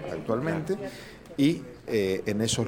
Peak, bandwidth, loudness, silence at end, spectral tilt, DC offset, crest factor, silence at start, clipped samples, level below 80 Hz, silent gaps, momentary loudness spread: -12 dBFS; 17 kHz; -28 LUFS; 0 s; -5 dB/octave; under 0.1%; 16 dB; 0 s; under 0.1%; -56 dBFS; none; 13 LU